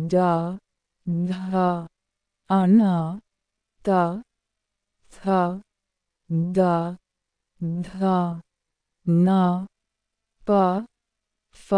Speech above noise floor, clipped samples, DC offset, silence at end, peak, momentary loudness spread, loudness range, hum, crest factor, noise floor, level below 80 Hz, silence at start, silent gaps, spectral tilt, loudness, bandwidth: 61 dB; under 0.1%; under 0.1%; 0 s; -8 dBFS; 18 LU; 3 LU; none; 16 dB; -82 dBFS; -60 dBFS; 0 s; none; -9 dB/octave; -23 LUFS; 10 kHz